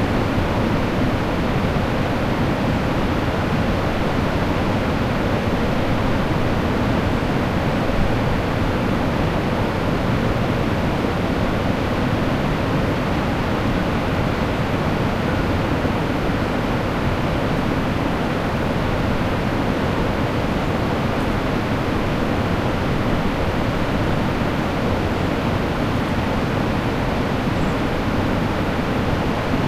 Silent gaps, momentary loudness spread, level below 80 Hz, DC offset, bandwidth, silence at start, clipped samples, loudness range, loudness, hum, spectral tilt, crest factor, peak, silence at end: none; 1 LU; -30 dBFS; under 0.1%; 15.5 kHz; 0 s; under 0.1%; 1 LU; -21 LUFS; none; -7 dB/octave; 14 dB; -6 dBFS; 0 s